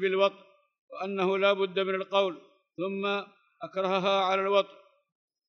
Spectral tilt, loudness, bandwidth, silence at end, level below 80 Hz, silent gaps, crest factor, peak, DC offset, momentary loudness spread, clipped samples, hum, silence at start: -5.5 dB/octave; -28 LUFS; 6.6 kHz; 0.8 s; under -90 dBFS; 0.79-0.88 s; 20 dB; -10 dBFS; under 0.1%; 18 LU; under 0.1%; none; 0 s